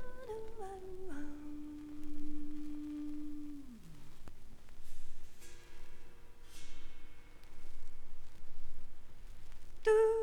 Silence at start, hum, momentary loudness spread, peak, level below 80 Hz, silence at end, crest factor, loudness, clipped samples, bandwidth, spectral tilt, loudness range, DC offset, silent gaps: 0 s; none; 16 LU; -18 dBFS; -48 dBFS; 0 s; 16 dB; -41 LUFS; under 0.1%; 10 kHz; -6 dB/octave; 11 LU; under 0.1%; none